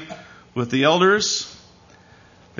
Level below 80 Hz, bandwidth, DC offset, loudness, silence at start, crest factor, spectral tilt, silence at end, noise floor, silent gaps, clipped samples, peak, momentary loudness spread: -60 dBFS; 7.4 kHz; under 0.1%; -19 LUFS; 0 s; 18 dB; -3.5 dB/octave; 1.05 s; -50 dBFS; none; under 0.1%; -4 dBFS; 21 LU